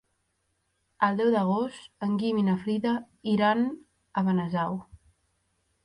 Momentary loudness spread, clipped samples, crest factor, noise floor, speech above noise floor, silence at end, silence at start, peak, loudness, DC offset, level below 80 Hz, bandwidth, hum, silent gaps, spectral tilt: 10 LU; under 0.1%; 20 dB; -75 dBFS; 49 dB; 1 s; 1 s; -10 dBFS; -27 LUFS; under 0.1%; -66 dBFS; 10.5 kHz; none; none; -8 dB/octave